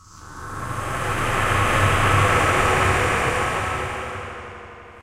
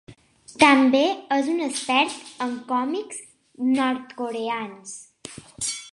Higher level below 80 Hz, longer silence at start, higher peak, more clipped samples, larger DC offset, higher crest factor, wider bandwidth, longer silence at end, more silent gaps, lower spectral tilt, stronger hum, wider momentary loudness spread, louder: first, -34 dBFS vs -66 dBFS; about the same, 0.1 s vs 0.1 s; about the same, -4 dBFS vs -2 dBFS; neither; neither; second, 16 dB vs 22 dB; first, 16 kHz vs 11.5 kHz; about the same, 0 s vs 0.05 s; neither; first, -4.5 dB/octave vs -2.5 dB/octave; neither; about the same, 19 LU vs 21 LU; about the same, -20 LUFS vs -22 LUFS